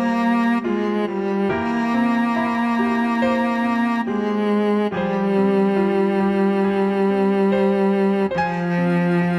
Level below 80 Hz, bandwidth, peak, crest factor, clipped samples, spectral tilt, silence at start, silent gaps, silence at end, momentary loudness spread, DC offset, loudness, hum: -56 dBFS; 10 kHz; -8 dBFS; 10 dB; under 0.1%; -8 dB/octave; 0 s; none; 0 s; 4 LU; under 0.1%; -19 LUFS; none